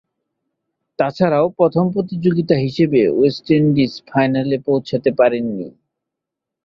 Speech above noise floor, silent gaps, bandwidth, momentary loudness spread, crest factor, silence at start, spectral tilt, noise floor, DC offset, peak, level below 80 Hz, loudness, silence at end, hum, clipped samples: 67 dB; none; 7.2 kHz; 7 LU; 16 dB; 1 s; -8.5 dB/octave; -83 dBFS; under 0.1%; -2 dBFS; -56 dBFS; -17 LUFS; 0.95 s; none; under 0.1%